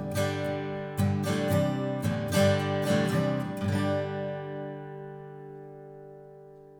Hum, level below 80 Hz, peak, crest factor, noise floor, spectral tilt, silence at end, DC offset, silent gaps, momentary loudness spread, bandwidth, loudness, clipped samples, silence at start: none; -60 dBFS; -10 dBFS; 18 dB; -49 dBFS; -6 dB/octave; 0 s; under 0.1%; none; 21 LU; over 20 kHz; -29 LUFS; under 0.1%; 0 s